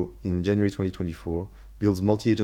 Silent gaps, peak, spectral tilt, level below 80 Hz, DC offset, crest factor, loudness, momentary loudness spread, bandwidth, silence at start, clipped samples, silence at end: none; -8 dBFS; -7.5 dB/octave; -46 dBFS; under 0.1%; 18 dB; -26 LUFS; 9 LU; 14.5 kHz; 0 s; under 0.1%; 0 s